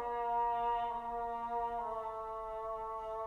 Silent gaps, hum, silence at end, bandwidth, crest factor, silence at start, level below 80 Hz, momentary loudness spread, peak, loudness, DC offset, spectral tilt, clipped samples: none; none; 0 s; 9.8 kHz; 12 dB; 0 s; -60 dBFS; 8 LU; -26 dBFS; -38 LUFS; under 0.1%; -5.5 dB/octave; under 0.1%